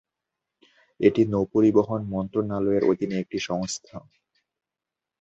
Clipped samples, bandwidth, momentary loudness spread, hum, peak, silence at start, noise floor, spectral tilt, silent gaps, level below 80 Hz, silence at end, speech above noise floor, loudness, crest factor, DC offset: under 0.1%; 8.2 kHz; 11 LU; none; -4 dBFS; 1 s; -88 dBFS; -6.5 dB/octave; none; -56 dBFS; 1.2 s; 65 dB; -24 LUFS; 20 dB; under 0.1%